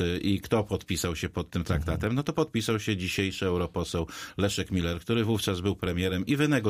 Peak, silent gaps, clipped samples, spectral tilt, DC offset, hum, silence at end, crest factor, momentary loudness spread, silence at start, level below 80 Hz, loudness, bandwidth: -12 dBFS; none; under 0.1%; -5.5 dB/octave; under 0.1%; none; 0 s; 16 dB; 4 LU; 0 s; -44 dBFS; -29 LUFS; 15.5 kHz